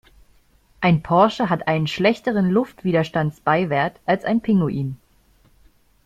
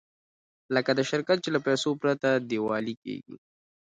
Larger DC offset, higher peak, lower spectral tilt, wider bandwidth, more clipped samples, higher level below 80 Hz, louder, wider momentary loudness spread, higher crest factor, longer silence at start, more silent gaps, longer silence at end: neither; first, -2 dBFS vs -10 dBFS; first, -7.5 dB/octave vs -5 dB/octave; first, 13 kHz vs 9.4 kHz; neither; first, -52 dBFS vs -74 dBFS; first, -20 LUFS vs -27 LUFS; second, 6 LU vs 10 LU; about the same, 18 dB vs 18 dB; about the same, 0.8 s vs 0.7 s; second, none vs 2.97-3.02 s; first, 1.1 s vs 0.45 s